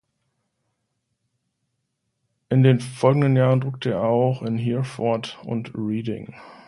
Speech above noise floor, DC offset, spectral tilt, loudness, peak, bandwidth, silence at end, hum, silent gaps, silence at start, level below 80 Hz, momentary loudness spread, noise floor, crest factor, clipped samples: 55 dB; under 0.1%; -8 dB/octave; -22 LUFS; -2 dBFS; 11.5 kHz; 0.15 s; none; none; 2.5 s; -62 dBFS; 12 LU; -76 dBFS; 20 dB; under 0.1%